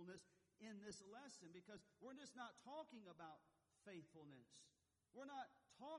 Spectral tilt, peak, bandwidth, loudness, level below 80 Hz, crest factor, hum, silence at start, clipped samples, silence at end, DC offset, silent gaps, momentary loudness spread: -4 dB/octave; -44 dBFS; 11 kHz; -61 LUFS; under -90 dBFS; 16 dB; none; 0 s; under 0.1%; 0 s; under 0.1%; none; 8 LU